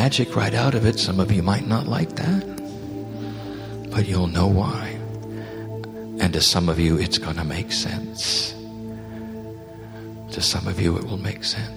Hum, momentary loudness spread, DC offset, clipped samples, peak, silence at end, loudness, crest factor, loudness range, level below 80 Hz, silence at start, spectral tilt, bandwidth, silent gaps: none; 15 LU; under 0.1%; under 0.1%; -4 dBFS; 0 s; -23 LUFS; 18 dB; 4 LU; -42 dBFS; 0 s; -5 dB/octave; over 20 kHz; none